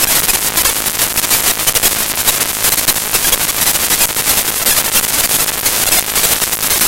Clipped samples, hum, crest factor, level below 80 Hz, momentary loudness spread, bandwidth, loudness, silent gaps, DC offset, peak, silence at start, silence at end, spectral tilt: under 0.1%; none; 14 dB; -36 dBFS; 2 LU; over 20 kHz; -11 LUFS; none; 0.5%; 0 dBFS; 0 s; 0 s; 0 dB/octave